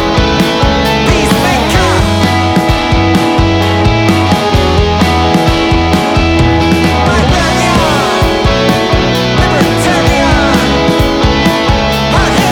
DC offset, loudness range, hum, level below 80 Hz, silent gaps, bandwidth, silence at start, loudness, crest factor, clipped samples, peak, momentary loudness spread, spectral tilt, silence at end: under 0.1%; 0 LU; none; -18 dBFS; none; 19.5 kHz; 0 s; -9 LUFS; 8 dB; under 0.1%; 0 dBFS; 1 LU; -5.5 dB/octave; 0 s